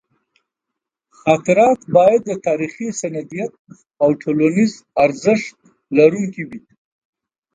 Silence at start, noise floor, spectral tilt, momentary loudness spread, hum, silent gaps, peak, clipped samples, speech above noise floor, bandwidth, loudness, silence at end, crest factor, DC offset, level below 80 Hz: 1.25 s; -82 dBFS; -6 dB/octave; 14 LU; none; 3.59-3.65 s; 0 dBFS; under 0.1%; 66 dB; 9.4 kHz; -17 LUFS; 0.95 s; 18 dB; under 0.1%; -60 dBFS